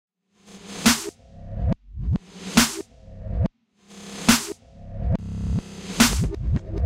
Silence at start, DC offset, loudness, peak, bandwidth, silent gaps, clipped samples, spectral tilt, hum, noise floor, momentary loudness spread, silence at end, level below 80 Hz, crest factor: 0.5 s; under 0.1%; -23 LUFS; 0 dBFS; 16 kHz; none; under 0.1%; -3.5 dB/octave; none; -52 dBFS; 20 LU; 0 s; -32 dBFS; 24 dB